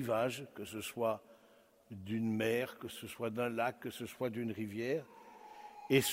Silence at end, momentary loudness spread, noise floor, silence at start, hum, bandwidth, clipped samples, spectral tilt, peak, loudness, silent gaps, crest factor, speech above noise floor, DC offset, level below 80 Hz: 0 s; 18 LU; -66 dBFS; 0 s; none; 16 kHz; under 0.1%; -4.5 dB/octave; -16 dBFS; -38 LUFS; none; 22 dB; 28 dB; under 0.1%; -76 dBFS